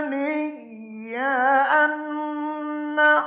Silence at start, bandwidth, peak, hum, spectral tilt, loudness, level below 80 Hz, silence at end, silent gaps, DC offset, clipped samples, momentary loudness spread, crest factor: 0 s; 4 kHz; -8 dBFS; none; -7 dB/octave; -22 LUFS; -82 dBFS; 0 s; none; under 0.1%; under 0.1%; 16 LU; 16 dB